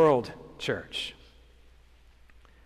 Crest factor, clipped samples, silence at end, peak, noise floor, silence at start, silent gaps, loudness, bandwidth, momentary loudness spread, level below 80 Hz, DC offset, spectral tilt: 20 dB; under 0.1%; 1.55 s; -10 dBFS; -56 dBFS; 0 s; none; -31 LUFS; 13.5 kHz; 16 LU; -56 dBFS; under 0.1%; -5.5 dB/octave